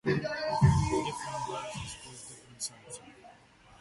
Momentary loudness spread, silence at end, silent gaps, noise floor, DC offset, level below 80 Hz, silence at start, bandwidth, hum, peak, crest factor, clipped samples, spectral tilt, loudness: 21 LU; 0.5 s; none; -58 dBFS; under 0.1%; -46 dBFS; 0.05 s; 12 kHz; none; -12 dBFS; 20 dB; under 0.1%; -5.5 dB/octave; -31 LUFS